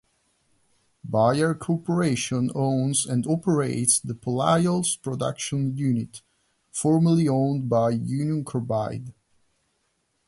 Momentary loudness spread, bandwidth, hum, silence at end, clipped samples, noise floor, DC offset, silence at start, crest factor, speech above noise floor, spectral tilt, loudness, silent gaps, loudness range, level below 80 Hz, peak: 8 LU; 11.5 kHz; none; 1.15 s; under 0.1%; -72 dBFS; under 0.1%; 1.05 s; 20 dB; 49 dB; -5.5 dB/octave; -24 LUFS; none; 2 LU; -60 dBFS; -4 dBFS